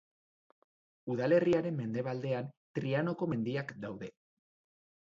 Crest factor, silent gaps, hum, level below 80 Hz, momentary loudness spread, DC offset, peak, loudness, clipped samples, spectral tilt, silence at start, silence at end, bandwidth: 18 dB; 2.57-2.74 s; none; -72 dBFS; 15 LU; under 0.1%; -16 dBFS; -34 LUFS; under 0.1%; -8.5 dB/octave; 1.05 s; 0.95 s; 7.6 kHz